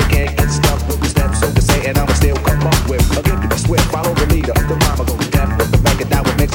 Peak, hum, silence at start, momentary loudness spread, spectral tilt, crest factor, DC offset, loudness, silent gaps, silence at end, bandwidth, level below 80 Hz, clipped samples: -2 dBFS; none; 0 s; 2 LU; -5 dB/octave; 12 dB; under 0.1%; -15 LUFS; none; 0 s; 19 kHz; -18 dBFS; under 0.1%